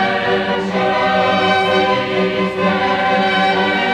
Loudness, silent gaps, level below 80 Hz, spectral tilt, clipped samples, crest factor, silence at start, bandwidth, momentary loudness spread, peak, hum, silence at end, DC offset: -15 LUFS; none; -50 dBFS; -5.5 dB/octave; under 0.1%; 12 dB; 0 s; 10.5 kHz; 3 LU; -2 dBFS; none; 0 s; under 0.1%